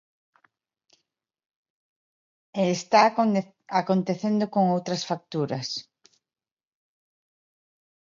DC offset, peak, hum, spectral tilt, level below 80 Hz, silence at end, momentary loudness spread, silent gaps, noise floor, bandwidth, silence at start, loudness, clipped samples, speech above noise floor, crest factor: under 0.1%; -4 dBFS; none; -5.5 dB/octave; -76 dBFS; 2.2 s; 11 LU; none; under -90 dBFS; 7.6 kHz; 2.55 s; -25 LUFS; under 0.1%; over 66 dB; 24 dB